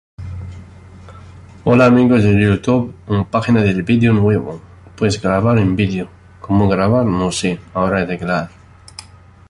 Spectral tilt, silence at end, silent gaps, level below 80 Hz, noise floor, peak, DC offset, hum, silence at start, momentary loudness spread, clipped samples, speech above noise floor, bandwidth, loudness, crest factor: -7 dB/octave; 0.5 s; none; -38 dBFS; -40 dBFS; -2 dBFS; under 0.1%; none; 0.2 s; 20 LU; under 0.1%; 26 dB; 11.5 kHz; -15 LUFS; 14 dB